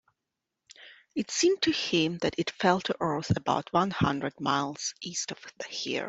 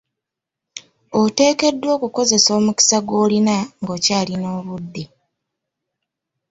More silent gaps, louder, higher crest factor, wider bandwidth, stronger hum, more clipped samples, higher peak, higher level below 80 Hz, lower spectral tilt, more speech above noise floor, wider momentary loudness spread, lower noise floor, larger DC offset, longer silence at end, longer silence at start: neither; second, -29 LUFS vs -17 LUFS; about the same, 22 dB vs 18 dB; about the same, 8.2 kHz vs 8 kHz; neither; neither; second, -8 dBFS vs -2 dBFS; about the same, -60 dBFS vs -60 dBFS; about the same, -4 dB/octave vs -3 dB/octave; second, 58 dB vs 66 dB; second, 9 LU vs 21 LU; about the same, -86 dBFS vs -84 dBFS; neither; second, 0 s vs 1.45 s; about the same, 0.8 s vs 0.75 s